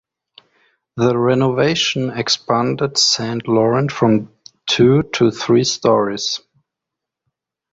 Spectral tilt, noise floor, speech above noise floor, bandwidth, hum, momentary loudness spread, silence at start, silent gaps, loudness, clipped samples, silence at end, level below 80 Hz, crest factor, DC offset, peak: -4.5 dB/octave; -83 dBFS; 67 dB; 8 kHz; none; 7 LU; 0.95 s; none; -16 LUFS; under 0.1%; 1.35 s; -54 dBFS; 16 dB; under 0.1%; -2 dBFS